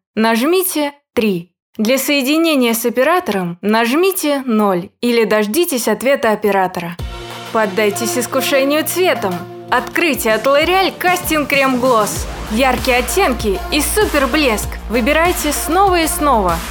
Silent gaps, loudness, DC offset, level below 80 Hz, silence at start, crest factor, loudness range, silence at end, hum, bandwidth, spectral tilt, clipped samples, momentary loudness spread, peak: 1.62-1.73 s; -15 LUFS; under 0.1%; -32 dBFS; 0.15 s; 14 dB; 2 LU; 0 s; none; over 20 kHz; -3.5 dB/octave; under 0.1%; 7 LU; 0 dBFS